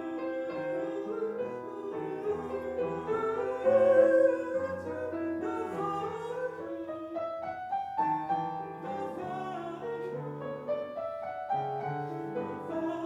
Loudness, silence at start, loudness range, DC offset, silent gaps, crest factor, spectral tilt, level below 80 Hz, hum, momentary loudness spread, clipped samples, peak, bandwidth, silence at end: -32 LUFS; 0 s; 8 LU; under 0.1%; none; 20 dB; -7.5 dB/octave; -72 dBFS; none; 12 LU; under 0.1%; -12 dBFS; 8.4 kHz; 0 s